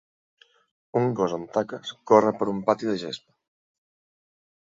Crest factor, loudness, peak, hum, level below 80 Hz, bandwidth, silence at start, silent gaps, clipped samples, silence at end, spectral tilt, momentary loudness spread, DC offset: 24 dB; -24 LUFS; -4 dBFS; none; -68 dBFS; 7.8 kHz; 0.95 s; none; under 0.1%; 1.5 s; -6.5 dB/octave; 15 LU; under 0.1%